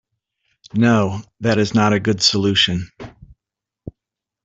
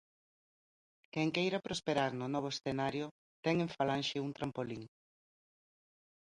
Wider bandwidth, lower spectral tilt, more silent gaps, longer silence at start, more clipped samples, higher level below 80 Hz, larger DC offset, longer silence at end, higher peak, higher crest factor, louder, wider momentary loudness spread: second, 8.2 kHz vs 11 kHz; about the same, -4.5 dB/octave vs -5.5 dB/octave; second, none vs 3.11-3.43 s; second, 0.75 s vs 1.15 s; neither; first, -52 dBFS vs -70 dBFS; neither; second, 0.55 s vs 1.35 s; first, 0 dBFS vs -18 dBFS; about the same, 18 dB vs 22 dB; first, -17 LUFS vs -37 LUFS; first, 15 LU vs 10 LU